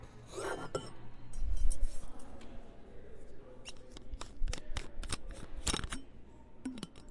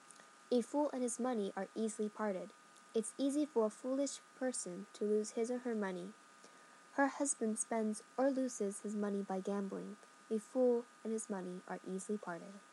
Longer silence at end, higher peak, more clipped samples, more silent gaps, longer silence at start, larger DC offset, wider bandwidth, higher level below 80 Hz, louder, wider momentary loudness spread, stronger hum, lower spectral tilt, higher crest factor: about the same, 0 s vs 0.05 s; first, -16 dBFS vs -20 dBFS; neither; neither; about the same, 0 s vs 0 s; neither; about the same, 11.5 kHz vs 12.5 kHz; first, -40 dBFS vs under -90 dBFS; second, -43 LUFS vs -39 LUFS; first, 17 LU vs 12 LU; neither; about the same, -3.5 dB/octave vs -4.5 dB/octave; about the same, 20 dB vs 18 dB